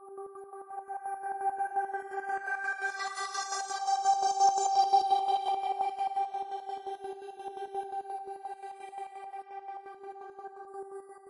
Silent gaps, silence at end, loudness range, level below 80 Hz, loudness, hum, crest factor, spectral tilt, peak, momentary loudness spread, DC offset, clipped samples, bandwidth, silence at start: none; 0 s; 13 LU; -84 dBFS; -32 LUFS; none; 20 dB; 0.5 dB/octave; -14 dBFS; 19 LU; under 0.1%; under 0.1%; 11 kHz; 0 s